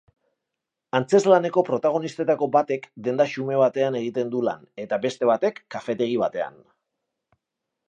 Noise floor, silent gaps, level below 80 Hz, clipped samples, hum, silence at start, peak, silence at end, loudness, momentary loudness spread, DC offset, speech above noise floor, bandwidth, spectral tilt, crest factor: -84 dBFS; none; -74 dBFS; under 0.1%; none; 0.95 s; -4 dBFS; 1.4 s; -23 LUFS; 10 LU; under 0.1%; 62 dB; 9.2 kHz; -6 dB/octave; 20 dB